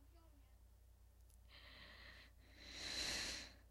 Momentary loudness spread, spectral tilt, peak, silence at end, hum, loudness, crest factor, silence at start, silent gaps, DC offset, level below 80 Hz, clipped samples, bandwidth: 26 LU; -1 dB/octave; -32 dBFS; 0 s; none; -47 LUFS; 22 dB; 0 s; none; under 0.1%; -64 dBFS; under 0.1%; 16 kHz